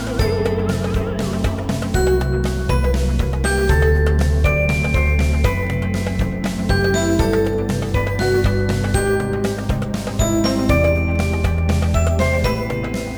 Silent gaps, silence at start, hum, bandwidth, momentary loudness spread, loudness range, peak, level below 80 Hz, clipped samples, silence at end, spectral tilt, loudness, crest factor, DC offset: none; 0 s; none; over 20 kHz; 5 LU; 2 LU; -4 dBFS; -22 dBFS; under 0.1%; 0 s; -6 dB/octave; -19 LUFS; 14 dB; under 0.1%